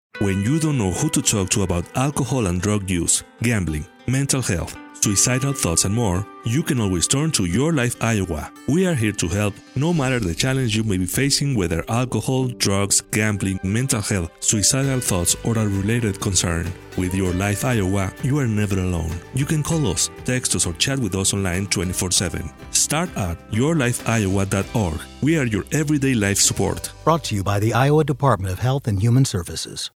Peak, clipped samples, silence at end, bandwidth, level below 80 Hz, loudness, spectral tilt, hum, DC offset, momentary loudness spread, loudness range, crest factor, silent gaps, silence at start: -2 dBFS; under 0.1%; 0.05 s; 16.5 kHz; -40 dBFS; -20 LUFS; -4 dB/octave; none; under 0.1%; 6 LU; 2 LU; 18 dB; none; 0.15 s